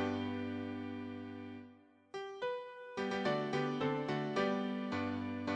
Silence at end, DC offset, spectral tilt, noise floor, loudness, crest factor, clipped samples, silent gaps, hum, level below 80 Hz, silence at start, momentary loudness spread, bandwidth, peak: 0 s; under 0.1%; -6.5 dB/octave; -61 dBFS; -39 LUFS; 16 dB; under 0.1%; none; none; -76 dBFS; 0 s; 12 LU; 9.2 kHz; -22 dBFS